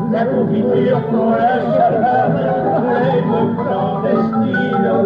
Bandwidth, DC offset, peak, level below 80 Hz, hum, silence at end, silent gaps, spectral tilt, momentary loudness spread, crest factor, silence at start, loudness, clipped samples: 5.2 kHz; under 0.1%; -2 dBFS; -52 dBFS; none; 0 s; none; -10 dB/octave; 2 LU; 12 dB; 0 s; -15 LUFS; under 0.1%